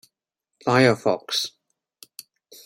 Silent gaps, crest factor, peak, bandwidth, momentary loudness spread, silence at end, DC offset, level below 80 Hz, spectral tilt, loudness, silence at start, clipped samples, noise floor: none; 22 dB; -4 dBFS; 16 kHz; 25 LU; 1.15 s; under 0.1%; -66 dBFS; -4.5 dB/octave; -22 LUFS; 0.65 s; under 0.1%; -83 dBFS